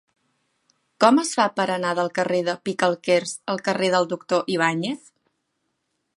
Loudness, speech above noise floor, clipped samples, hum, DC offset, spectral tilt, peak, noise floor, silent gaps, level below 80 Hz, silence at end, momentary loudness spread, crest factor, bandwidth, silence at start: -22 LUFS; 53 dB; under 0.1%; none; under 0.1%; -4 dB/octave; -2 dBFS; -75 dBFS; none; -74 dBFS; 1.25 s; 8 LU; 22 dB; 11.5 kHz; 1 s